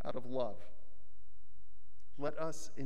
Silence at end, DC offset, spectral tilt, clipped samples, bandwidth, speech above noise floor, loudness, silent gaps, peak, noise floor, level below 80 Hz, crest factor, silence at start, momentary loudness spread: 0 s; 3%; -5.5 dB/octave; under 0.1%; 14.5 kHz; 25 dB; -42 LUFS; none; -22 dBFS; -66 dBFS; -68 dBFS; 20 dB; 0 s; 21 LU